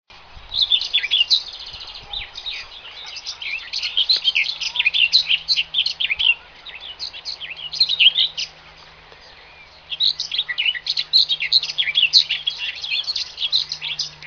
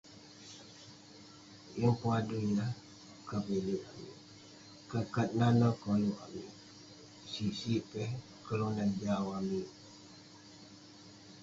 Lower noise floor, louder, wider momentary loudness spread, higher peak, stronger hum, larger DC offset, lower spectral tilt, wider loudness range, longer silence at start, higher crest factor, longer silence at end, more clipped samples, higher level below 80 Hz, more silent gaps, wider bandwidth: second, -45 dBFS vs -55 dBFS; first, -17 LUFS vs -35 LUFS; second, 16 LU vs 23 LU; first, -2 dBFS vs -16 dBFS; neither; neither; second, 2 dB/octave vs -7 dB/octave; about the same, 4 LU vs 4 LU; about the same, 0.1 s vs 0.05 s; about the same, 20 dB vs 20 dB; about the same, 0 s vs 0 s; neither; first, -54 dBFS vs -66 dBFS; neither; second, 5.4 kHz vs 7.8 kHz